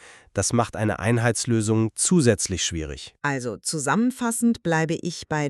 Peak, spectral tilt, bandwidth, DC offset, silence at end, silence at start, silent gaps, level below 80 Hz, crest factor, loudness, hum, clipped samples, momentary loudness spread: -6 dBFS; -4.5 dB/octave; 13.5 kHz; under 0.1%; 0 s; 0.05 s; none; -48 dBFS; 18 dB; -23 LUFS; none; under 0.1%; 8 LU